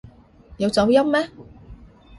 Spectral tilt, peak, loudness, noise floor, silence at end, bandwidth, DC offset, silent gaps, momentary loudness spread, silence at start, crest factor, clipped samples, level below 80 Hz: -5.5 dB/octave; -4 dBFS; -19 LUFS; -48 dBFS; 0.45 s; 11.5 kHz; under 0.1%; none; 10 LU; 0.5 s; 18 dB; under 0.1%; -48 dBFS